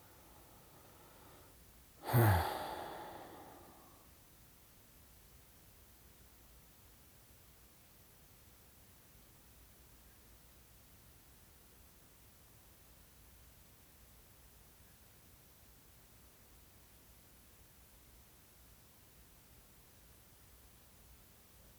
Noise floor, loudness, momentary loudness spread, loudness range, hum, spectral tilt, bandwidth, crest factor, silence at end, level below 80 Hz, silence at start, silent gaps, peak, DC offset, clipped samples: -63 dBFS; -37 LUFS; 11 LU; 22 LU; none; -6 dB/octave; over 20 kHz; 30 dB; 0.65 s; -66 dBFS; 0.25 s; none; -18 dBFS; under 0.1%; under 0.1%